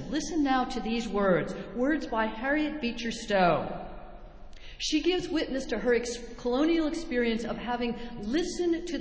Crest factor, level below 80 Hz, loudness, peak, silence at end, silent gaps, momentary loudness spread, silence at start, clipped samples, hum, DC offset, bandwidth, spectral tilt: 18 dB; -48 dBFS; -29 LUFS; -12 dBFS; 0 s; none; 9 LU; 0 s; under 0.1%; none; under 0.1%; 8 kHz; -4.5 dB/octave